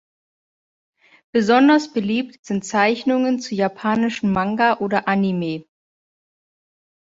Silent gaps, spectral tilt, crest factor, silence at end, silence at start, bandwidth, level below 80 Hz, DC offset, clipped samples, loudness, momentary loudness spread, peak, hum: 2.39-2.43 s; -5.5 dB/octave; 18 dB; 1.4 s; 1.35 s; 7.8 kHz; -58 dBFS; under 0.1%; under 0.1%; -19 LUFS; 10 LU; -2 dBFS; none